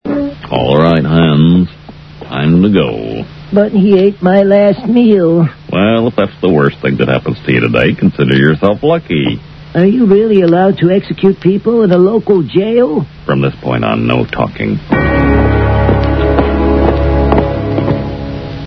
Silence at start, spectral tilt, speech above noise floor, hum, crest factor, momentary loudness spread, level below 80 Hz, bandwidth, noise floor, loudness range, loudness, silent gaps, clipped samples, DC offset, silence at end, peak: 0.05 s; -9.5 dB/octave; 22 dB; none; 10 dB; 8 LU; -24 dBFS; 6 kHz; -32 dBFS; 2 LU; -11 LUFS; none; 0.2%; under 0.1%; 0 s; 0 dBFS